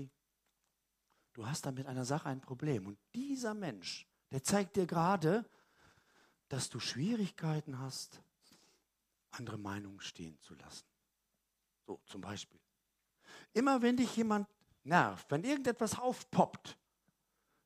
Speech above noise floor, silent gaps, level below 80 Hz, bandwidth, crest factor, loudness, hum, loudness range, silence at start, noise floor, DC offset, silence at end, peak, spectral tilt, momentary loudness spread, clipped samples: 48 dB; none; -76 dBFS; 15.5 kHz; 26 dB; -37 LUFS; none; 15 LU; 0 s; -85 dBFS; under 0.1%; 0.9 s; -12 dBFS; -5 dB/octave; 20 LU; under 0.1%